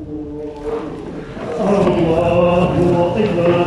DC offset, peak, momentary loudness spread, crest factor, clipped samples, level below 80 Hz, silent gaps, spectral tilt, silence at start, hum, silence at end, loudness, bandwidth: under 0.1%; -2 dBFS; 14 LU; 14 dB; under 0.1%; -36 dBFS; none; -8 dB/octave; 0 s; none; 0 s; -16 LUFS; 11 kHz